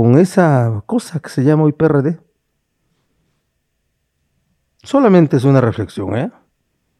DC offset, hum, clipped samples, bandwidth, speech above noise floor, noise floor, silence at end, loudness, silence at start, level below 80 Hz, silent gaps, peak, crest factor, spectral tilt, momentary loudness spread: under 0.1%; none; under 0.1%; 12.5 kHz; 55 dB; -68 dBFS; 0.7 s; -14 LUFS; 0 s; -54 dBFS; none; 0 dBFS; 16 dB; -8.5 dB/octave; 11 LU